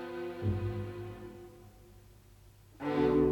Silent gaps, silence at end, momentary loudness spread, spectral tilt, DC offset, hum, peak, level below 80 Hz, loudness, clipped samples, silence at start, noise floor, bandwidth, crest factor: none; 0 s; 24 LU; -8.5 dB/octave; under 0.1%; none; -16 dBFS; -54 dBFS; -35 LUFS; under 0.1%; 0 s; -58 dBFS; 17.5 kHz; 18 dB